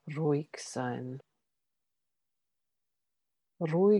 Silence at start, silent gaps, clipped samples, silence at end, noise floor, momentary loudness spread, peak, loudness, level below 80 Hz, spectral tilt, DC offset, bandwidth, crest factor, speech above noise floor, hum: 0.05 s; none; under 0.1%; 0 s; -88 dBFS; 12 LU; -16 dBFS; -34 LUFS; -86 dBFS; -7 dB/octave; under 0.1%; 11.5 kHz; 18 dB; 58 dB; none